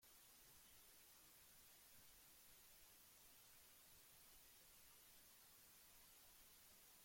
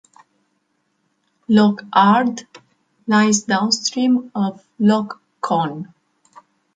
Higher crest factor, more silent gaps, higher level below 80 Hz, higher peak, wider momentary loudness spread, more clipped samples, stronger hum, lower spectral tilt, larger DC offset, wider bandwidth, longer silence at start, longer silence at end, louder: about the same, 14 dB vs 18 dB; neither; second, -84 dBFS vs -64 dBFS; second, -56 dBFS vs -2 dBFS; second, 0 LU vs 18 LU; neither; neither; second, -0.5 dB/octave vs -4.5 dB/octave; neither; first, 16.5 kHz vs 9.2 kHz; second, 0 s vs 1.5 s; second, 0 s vs 0.9 s; second, -66 LUFS vs -17 LUFS